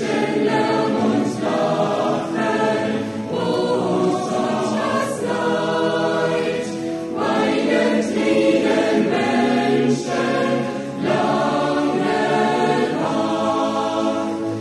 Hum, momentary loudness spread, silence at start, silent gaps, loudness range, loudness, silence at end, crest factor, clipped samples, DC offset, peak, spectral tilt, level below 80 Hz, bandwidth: none; 5 LU; 0 s; none; 3 LU; -20 LUFS; 0 s; 14 dB; under 0.1%; under 0.1%; -6 dBFS; -5.5 dB/octave; -56 dBFS; 12 kHz